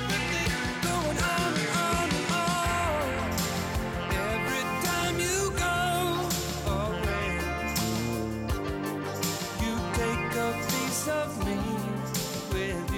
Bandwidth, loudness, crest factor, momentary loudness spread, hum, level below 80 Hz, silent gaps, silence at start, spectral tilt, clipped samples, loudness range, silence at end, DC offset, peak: 19.5 kHz; -29 LUFS; 12 dB; 5 LU; none; -42 dBFS; none; 0 s; -4 dB/octave; under 0.1%; 3 LU; 0 s; under 0.1%; -16 dBFS